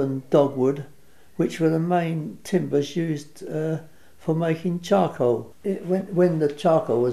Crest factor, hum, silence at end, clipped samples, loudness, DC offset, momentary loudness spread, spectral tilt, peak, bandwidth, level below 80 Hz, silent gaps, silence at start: 18 dB; none; 0 s; under 0.1%; -24 LUFS; 0.4%; 11 LU; -7.5 dB/octave; -6 dBFS; 13.5 kHz; -64 dBFS; none; 0 s